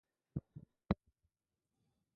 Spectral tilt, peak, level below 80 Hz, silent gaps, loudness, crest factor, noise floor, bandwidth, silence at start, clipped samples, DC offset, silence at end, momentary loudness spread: -8 dB/octave; -20 dBFS; -60 dBFS; none; -45 LUFS; 28 dB; under -90 dBFS; 4.6 kHz; 0.35 s; under 0.1%; under 0.1%; 1.2 s; 18 LU